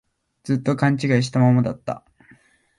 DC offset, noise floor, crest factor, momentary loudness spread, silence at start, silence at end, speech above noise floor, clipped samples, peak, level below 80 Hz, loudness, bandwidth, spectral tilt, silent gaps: under 0.1%; -55 dBFS; 16 dB; 15 LU; 0.45 s; 0.8 s; 36 dB; under 0.1%; -4 dBFS; -58 dBFS; -20 LUFS; 11.5 kHz; -7 dB/octave; none